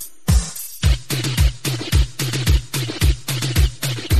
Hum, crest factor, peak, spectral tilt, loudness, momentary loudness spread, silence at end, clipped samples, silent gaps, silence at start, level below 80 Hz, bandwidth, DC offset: none; 14 dB; -4 dBFS; -4 dB/octave; -20 LUFS; 4 LU; 0 s; under 0.1%; none; 0 s; -22 dBFS; 13.5 kHz; 1%